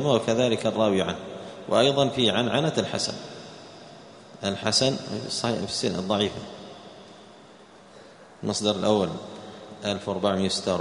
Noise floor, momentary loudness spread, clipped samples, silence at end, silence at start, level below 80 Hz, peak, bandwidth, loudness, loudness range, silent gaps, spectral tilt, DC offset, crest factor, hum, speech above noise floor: -50 dBFS; 21 LU; under 0.1%; 0 s; 0 s; -60 dBFS; -6 dBFS; 10.5 kHz; -25 LUFS; 6 LU; none; -4.5 dB/octave; under 0.1%; 20 dB; none; 25 dB